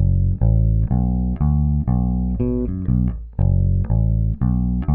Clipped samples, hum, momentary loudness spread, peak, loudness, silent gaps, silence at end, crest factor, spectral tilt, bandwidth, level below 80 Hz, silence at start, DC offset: under 0.1%; none; 4 LU; -6 dBFS; -20 LUFS; none; 0 s; 12 dB; -14 dB/octave; 2.4 kHz; -22 dBFS; 0 s; under 0.1%